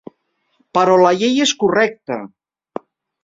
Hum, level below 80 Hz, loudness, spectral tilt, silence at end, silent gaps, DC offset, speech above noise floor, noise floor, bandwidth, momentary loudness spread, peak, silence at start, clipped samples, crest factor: none; -60 dBFS; -15 LUFS; -3.5 dB/octave; 0.95 s; none; under 0.1%; 51 dB; -66 dBFS; 7.8 kHz; 21 LU; -2 dBFS; 0.75 s; under 0.1%; 16 dB